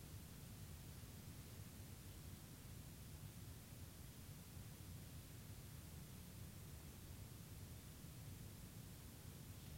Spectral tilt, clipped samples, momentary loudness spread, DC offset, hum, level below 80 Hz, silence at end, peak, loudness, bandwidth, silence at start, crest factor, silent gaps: -4.5 dB/octave; under 0.1%; 1 LU; under 0.1%; none; -64 dBFS; 0 s; -44 dBFS; -57 LUFS; 16 kHz; 0 s; 14 dB; none